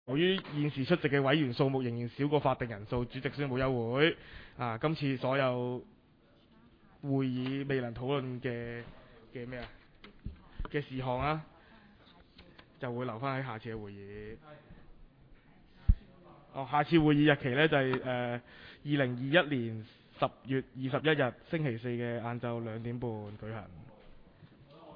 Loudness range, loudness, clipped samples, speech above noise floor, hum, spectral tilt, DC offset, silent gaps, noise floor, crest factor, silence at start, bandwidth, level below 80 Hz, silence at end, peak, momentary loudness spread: 10 LU; -33 LUFS; under 0.1%; 31 dB; none; -9.5 dB/octave; under 0.1%; none; -64 dBFS; 22 dB; 0.05 s; 5.2 kHz; -48 dBFS; 0 s; -12 dBFS; 18 LU